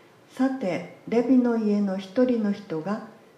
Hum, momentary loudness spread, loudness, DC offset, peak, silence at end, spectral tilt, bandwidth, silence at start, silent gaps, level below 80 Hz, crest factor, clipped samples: none; 10 LU; -25 LUFS; under 0.1%; -10 dBFS; 0.25 s; -8 dB/octave; 8.8 kHz; 0.35 s; none; -74 dBFS; 16 dB; under 0.1%